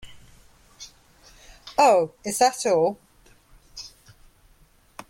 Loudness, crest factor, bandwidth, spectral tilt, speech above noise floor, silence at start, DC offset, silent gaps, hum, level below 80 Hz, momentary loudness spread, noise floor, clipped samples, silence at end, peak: -21 LUFS; 20 dB; 16.5 kHz; -3 dB/octave; 37 dB; 0.05 s; under 0.1%; none; none; -58 dBFS; 26 LU; -57 dBFS; under 0.1%; 1.25 s; -6 dBFS